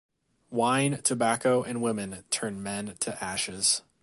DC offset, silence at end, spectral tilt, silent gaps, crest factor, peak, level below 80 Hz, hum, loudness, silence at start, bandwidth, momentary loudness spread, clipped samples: under 0.1%; 0.2 s; -3 dB/octave; none; 20 dB; -10 dBFS; -64 dBFS; none; -28 LUFS; 0.5 s; 12 kHz; 9 LU; under 0.1%